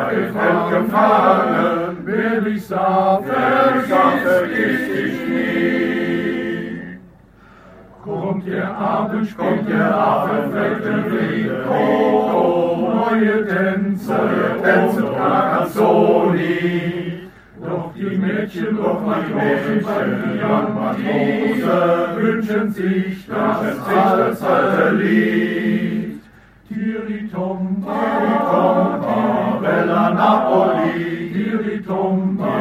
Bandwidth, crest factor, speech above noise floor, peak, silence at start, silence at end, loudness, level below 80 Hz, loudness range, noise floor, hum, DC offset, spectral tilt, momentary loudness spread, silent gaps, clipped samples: 15.5 kHz; 16 dB; 29 dB; 0 dBFS; 0 s; 0 s; -18 LUFS; -54 dBFS; 5 LU; -46 dBFS; none; under 0.1%; -7.5 dB/octave; 9 LU; none; under 0.1%